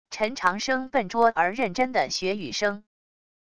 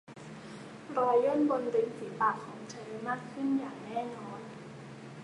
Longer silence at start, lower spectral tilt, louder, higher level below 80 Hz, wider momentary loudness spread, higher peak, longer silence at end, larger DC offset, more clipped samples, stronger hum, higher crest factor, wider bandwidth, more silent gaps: about the same, 0.05 s vs 0.1 s; second, -3.5 dB/octave vs -6.5 dB/octave; first, -25 LUFS vs -32 LUFS; first, -60 dBFS vs -76 dBFS; second, 6 LU vs 19 LU; first, -8 dBFS vs -16 dBFS; first, 0.7 s vs 0 s; first, 0.5% vs under 0.1%; neither; neither; about the same, 20 dB vs 18 dB; about the same, 11 kHz vs 11 kHz; neither